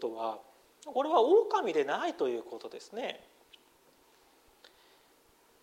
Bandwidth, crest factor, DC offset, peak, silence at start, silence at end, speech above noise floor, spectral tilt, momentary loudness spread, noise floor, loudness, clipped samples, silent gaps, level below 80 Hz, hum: 15.5 kHz; 20 dB; under 0.1%; -12 dBFS; 0 s; 2.45 s; 34 dB; -4 dB/octave; 20 LU; -65 dBFS; -31 LUFS; under 0.1%; none; -80 dBFS; none